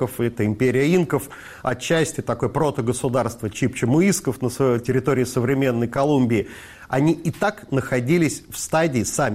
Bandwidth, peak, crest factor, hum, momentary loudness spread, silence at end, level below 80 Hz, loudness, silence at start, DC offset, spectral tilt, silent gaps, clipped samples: 16 kHz; -8 dBFS; 14 dB; none; 7 LU; 0 s; -50 dBFS; -21 LUFS; 0 s; under 0.1%; -6 dB/octave; none; under 0.1%